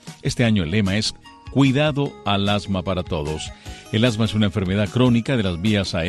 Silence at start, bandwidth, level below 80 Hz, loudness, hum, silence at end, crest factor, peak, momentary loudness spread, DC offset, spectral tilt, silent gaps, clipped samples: 0.05 s; 12.5 kHz; -42 dBFS; -21 LUFS; none; 0 s; 16 dB; -4 dBFS; 8 LU; under 0.1%; -6 dB/octave; none; under 0.1%